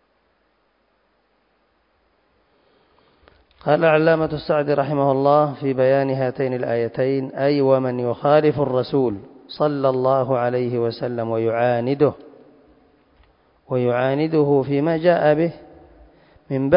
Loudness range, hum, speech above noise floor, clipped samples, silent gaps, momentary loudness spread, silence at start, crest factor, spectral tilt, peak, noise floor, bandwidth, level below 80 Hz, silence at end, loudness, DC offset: 4 LU; none; 46 dB; under 0.1%; none; 7 LU; 3.65 s; 18 dB; -12 dB/octave; -2 dBFS; -65 dBFS; 5.4 kHz; -58 dBFS; 0 s; -19 LUFS; under 0.1%